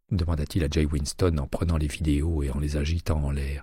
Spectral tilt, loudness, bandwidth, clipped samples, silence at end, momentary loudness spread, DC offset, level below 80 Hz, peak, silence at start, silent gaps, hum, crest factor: -6.5 dB/octave; -27 LUFS; 15 kHz; under 0.1%; 0 s; 3 LU; under 0.1%; -30 dBFS; -12 dBFS; 0.1 s; none; none; 14 dB